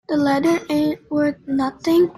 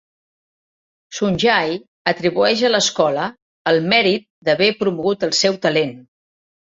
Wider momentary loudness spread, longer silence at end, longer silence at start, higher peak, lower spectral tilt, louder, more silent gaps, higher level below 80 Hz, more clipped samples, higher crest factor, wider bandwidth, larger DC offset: second, 4 LU vs 9 LU; second, 0.05 s vs 0.7 s; second, 0.1 s vs 1.1 s; second, -8 dBFS vs -2 dBFS; first, -6 dB/octave vs -3.5 dB/octave; second, -20 LUFS vs -17 LUFS; second, none vs 1.88-2.05 s, 3.42-3.65 s, 4.30-4.42 s; about the same, -54 dBFS vs -56 dBFS; neither; second, 12 dB vs 18 dB; first, 14.5 kHz vs 7.8 kHz; neither